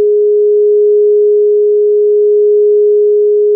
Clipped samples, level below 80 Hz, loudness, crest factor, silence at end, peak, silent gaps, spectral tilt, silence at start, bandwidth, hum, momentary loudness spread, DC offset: under 0.1%; under -90 dBFS; -9 LUFS; 4 dB; 0 s; -4 dBFS; none; -1 dB/octave; 0 s; 0.6 kHz; none; 1 LU; under 0.1%